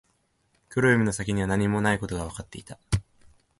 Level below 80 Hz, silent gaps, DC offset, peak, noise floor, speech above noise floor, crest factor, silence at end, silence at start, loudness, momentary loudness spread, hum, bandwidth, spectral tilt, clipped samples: -44 dBFS; none; under 0.1%; -8 dBFS; -70 dBFS; 45 dB; 20 dB; 0.6 s; 0.7 s; -26 LUFS; 17 LU; none; 11.5 kHz; -6 dB/octave; under 0.1%